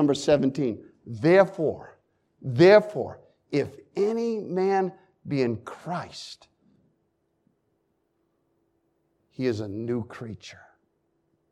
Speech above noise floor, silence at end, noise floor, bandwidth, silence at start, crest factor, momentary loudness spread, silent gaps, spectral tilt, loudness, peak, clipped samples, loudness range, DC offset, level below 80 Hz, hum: 49 dB; 0.95 s; -73 dBFS; 11 kHz; 0 s; 22 dB; 20 LU; none; -6.5 dB/octave; -24 LUFS; -4 dBFS; under 0.1%; 14 LU; under 0.1%; -66 dBFS; none